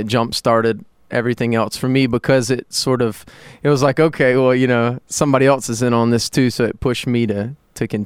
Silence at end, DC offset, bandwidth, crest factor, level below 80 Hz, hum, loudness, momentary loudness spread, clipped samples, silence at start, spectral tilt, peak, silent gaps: 0 s; under 0.1%; 15.5 kHz; 16 dB; -46 dBFS; none; -17 LUFS; 8 LU; under 0.1%; 0 s; -5.5 dB/octave; 0 dBFS; none